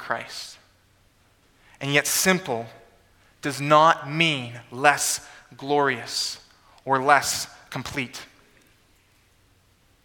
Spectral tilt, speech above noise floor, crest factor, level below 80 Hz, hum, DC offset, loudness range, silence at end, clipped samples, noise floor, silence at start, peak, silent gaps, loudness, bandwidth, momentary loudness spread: -3 dB/octave; 38 dB; 26 dB; -62 dBFS; none; under 0.1%; 5 LU; 1.8 s; under 0.1%; -61 dBFS; 0 s; 0 dBFS; none; -23 LUFS; 19 kHz; 18 LU